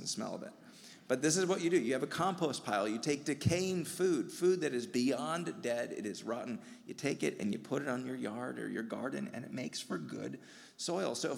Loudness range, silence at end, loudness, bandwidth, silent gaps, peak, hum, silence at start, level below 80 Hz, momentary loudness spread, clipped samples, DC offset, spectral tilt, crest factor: 6 LU; 0 s; -36 LUFS; 16.5 kHz; none; -16 dBFS; none; 0 s; -74 dBFS; 12 LU; under 0.1%; under 0.1%; -4.5 dB/octave; 20 dB